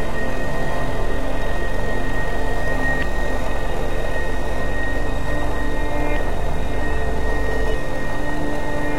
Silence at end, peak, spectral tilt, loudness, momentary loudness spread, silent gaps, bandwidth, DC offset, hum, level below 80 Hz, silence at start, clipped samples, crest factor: 0 s; -6 dBFS; -6 dB/octave; -25 LUFS; 2 LU; none; 14 kHz; 10%; none; -24 dBFS; 0 s; under 0.1%; 14 dB